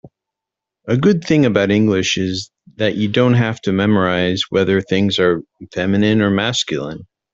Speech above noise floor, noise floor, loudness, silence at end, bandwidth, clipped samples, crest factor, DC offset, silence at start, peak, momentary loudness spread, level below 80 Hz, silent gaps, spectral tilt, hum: 69 dB; -84 dBFS; -16 LUFS; 0.3 s; 7.8 kHz; under 0.1%; 14 dB; under 0.1%; 0.05 s; -2 dBFS; 10 LU; -52 dBFS; none; -5.5 dB/octave; none